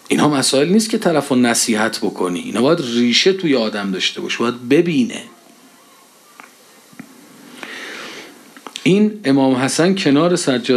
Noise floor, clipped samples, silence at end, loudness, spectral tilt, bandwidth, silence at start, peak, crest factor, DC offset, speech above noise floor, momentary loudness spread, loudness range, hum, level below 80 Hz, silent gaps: -47 dBFS; under 0.1%; 0 s; -16 LUFS; -4 dB/octave; 14 kHz; 0.1 s; 0 dBFS; 16 dB; under 0.1%; 32 dB; 15 LU; 16 LU; none; -70 dBFS; none